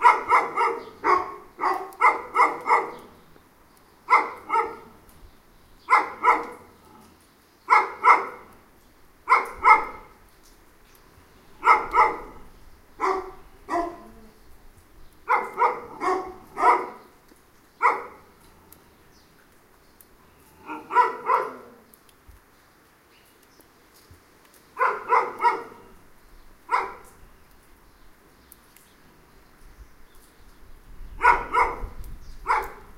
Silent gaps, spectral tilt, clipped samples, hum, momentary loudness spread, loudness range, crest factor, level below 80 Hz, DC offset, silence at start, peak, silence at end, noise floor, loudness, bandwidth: none; -3.5 dB/octave; under 0.1%; none; 22 LU; 9 LU; 26 dB; -50 dBFS; under 0.1%; 0 s; -2 dBFS; 0.2 s; -57 dBFS; -22 LUFS; 16 kHz